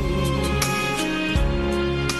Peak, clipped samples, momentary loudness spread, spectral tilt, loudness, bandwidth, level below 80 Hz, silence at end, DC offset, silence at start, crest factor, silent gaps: -6 dBFS; under 0.1%; 1 LU; -4.5 dB/octave; -22 LUFS; 12.5 kHz; -28 dBFS; 0 s; under 0.1%; 0 s; 16 dB; none